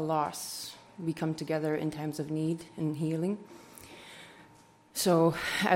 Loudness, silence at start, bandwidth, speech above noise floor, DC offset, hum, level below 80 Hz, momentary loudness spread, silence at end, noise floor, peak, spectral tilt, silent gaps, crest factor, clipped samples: -32 LUFS; 0 s; 16.5 kHz; 28 dB; under 0.1%; none; -68 dBFS; 22 LU; 0 s; -59 dBFS; -12 dBFS; -5 dB/octave; none; 20 dB; under 0.1%